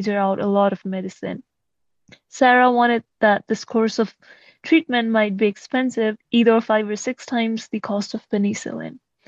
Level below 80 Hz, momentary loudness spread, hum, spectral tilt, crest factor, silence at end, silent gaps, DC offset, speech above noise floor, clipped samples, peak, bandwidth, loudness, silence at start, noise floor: -70 dBFS; 14 LU; none; -5 dB/octave; 18 dB; 0.3 s; none; under 0.1%; 59 dB; under 0.1%; -2 dBFS; 8 kHz; -20 LUFS; 0 s; -79 dBFS